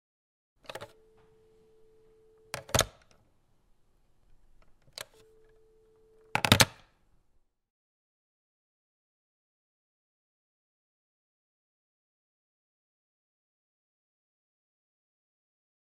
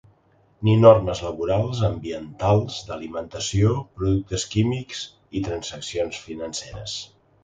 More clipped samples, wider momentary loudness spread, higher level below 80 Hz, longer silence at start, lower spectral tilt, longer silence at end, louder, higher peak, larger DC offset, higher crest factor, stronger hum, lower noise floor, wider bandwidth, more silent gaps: neither; first, 26 LU vs 15 LU; second, -58 dBFS vs -44 dBFS; first, 0.75 s vs 0.6 s; second, -2.5 dB/octave vs -6 dB/octave; first, 9.2 s vs 0.4 s; second, -26 LUFS vs -23 LUFS; about the same, -2 dBFS vs -2 dBFS; neither; first, 36 dB vs 22 dB; neither; first, -69 dBFS vs -60 dBFS; first, 15.5 kHz vs 9.2 kHz; neither